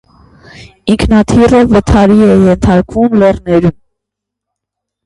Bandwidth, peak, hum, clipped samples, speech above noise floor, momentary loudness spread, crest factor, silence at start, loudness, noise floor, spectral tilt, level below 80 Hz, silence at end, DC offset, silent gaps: 11.5 kHz; 0 dBFS; 50 Hz at -35 dBFS; 0.1%; 71 dB; 6 LU; 10 dB; 0.6 s; -8 LUFS; -78 dBFS; -7.5 dB/octave; -24 dBFS; 1.35 s; under 0.1%; none